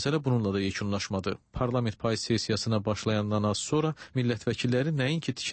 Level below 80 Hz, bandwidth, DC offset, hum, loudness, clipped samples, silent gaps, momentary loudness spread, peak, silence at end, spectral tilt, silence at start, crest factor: -54 dBFS; 8.8 kHz; under 0.1%; none; -29 LUFS; under 0.1%; none; 4 LU; -14 dBFS; 0 s; -5.5 dB/octave; 0 s; 14 dB